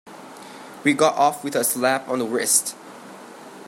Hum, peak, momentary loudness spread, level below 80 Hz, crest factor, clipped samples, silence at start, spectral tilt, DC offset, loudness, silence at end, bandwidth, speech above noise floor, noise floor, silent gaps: none; -4 dBFS; 22 LU; -74 dBFS; 20 dB; under 0.1%; 0.05 s; -2.5 dB/octave; under 0.1%; -20 LUFS; 0 s; 16 kHz; 20 dB; -41 dBFS; none